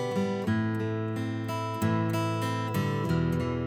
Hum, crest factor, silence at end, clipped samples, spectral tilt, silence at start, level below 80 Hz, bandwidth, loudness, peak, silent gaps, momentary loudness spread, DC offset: none; 14 dB; 0 s; under 0.1%; -7 dB/octave; 0 s; -52 dBFS; 19 kHz; -29 LUFS; -14 dBFS; none; 4 LU; under 0.1%